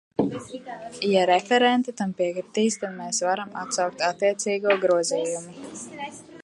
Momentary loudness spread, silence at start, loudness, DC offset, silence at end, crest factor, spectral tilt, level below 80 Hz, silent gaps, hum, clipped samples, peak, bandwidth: 17 LU; 0.2 s; -24 LUFS; under 0.1%; 0 s; 20 dB; -3.5 dB/octave; -68 dBFS; none; none; under 0.1%; -6 dBFS; 11.5 kHz